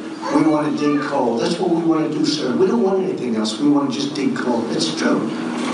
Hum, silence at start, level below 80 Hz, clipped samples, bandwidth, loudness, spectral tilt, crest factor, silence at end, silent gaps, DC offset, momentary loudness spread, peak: none; 0 s; -64 dBFS; under 0.1%; 11 kHz; -19 LUFS; -5 dB/octave; 14 dB; 0 s; none; under 0.1%; 4 LU; -4 dBFS